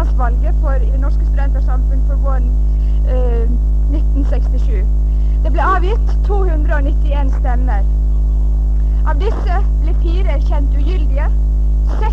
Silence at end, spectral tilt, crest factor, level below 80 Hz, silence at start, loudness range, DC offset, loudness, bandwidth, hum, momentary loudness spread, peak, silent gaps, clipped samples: 0 s; -8.5 dB/octave; 10 dB; -12 dBFS; 0 s; 1 LU; 2%; -16 LUFS; 3.3 kHz; none; 1 LU; -2 dBFS; none; under 0.1%